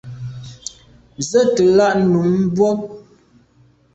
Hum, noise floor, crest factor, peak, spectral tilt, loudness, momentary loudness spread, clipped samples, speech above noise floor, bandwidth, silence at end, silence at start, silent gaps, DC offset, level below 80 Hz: none; -53 dBFS; 16 dB; -2 dBFS; -6 dB/octave; -16 LUFS; 19 LU; under 0.1%; 39 dB; 8.2 kHz; 0.95 s; 0.05 s; none; under 0.1%; -52 dBFS